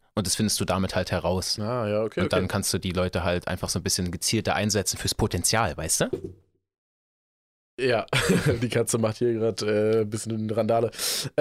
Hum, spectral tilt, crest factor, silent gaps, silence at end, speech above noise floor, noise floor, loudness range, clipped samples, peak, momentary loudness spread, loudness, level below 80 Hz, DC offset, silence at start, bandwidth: none; -4 dB/octave; 18 dB; 6.78-7.78 s; 0 s; over 65 dB; under -90 dBFS; 2 LU; under 0.1%; -8 dBFS; 4 LU; -25 LUFS; -48 dBFS; under 0.1%; 0.15 s; 16 kHz